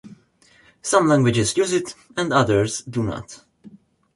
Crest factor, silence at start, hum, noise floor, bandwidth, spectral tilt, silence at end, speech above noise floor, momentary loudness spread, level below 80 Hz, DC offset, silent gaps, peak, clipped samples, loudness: 18 dB; 0.05 s; none; -56 dBFS; 11.5 kHz; -5 dB/octave; 0.45 s; 36 dB; 14 LU; -50 dBFS; under 0.1%; none; -2 dBFS; under 0.1%; -20 LUFS